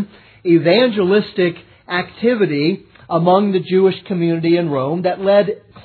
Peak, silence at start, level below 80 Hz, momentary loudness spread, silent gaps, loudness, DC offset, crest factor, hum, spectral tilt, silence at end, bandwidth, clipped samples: 0 dBFS; 0 s; -60 dBFS; 9 LU; none; -16 LUFS; under 0.1%; 16 dB; none; -10 dB/octave; 0.05 s; 4.6 kHz; under 0.1%